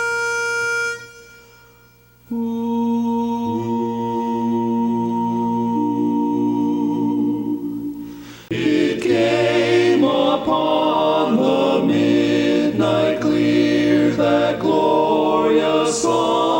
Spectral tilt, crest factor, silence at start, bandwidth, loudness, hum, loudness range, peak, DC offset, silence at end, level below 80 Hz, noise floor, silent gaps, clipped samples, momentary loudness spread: -5.5 dB/octave; 14 dB; 0 s; 16.5 kHz; -18 LUFS; none; 6 LU; -4 dBFS; under 0.1%; 0 s; -54 dBFS; -50 dBFS; none; under 0.1%; 7 LU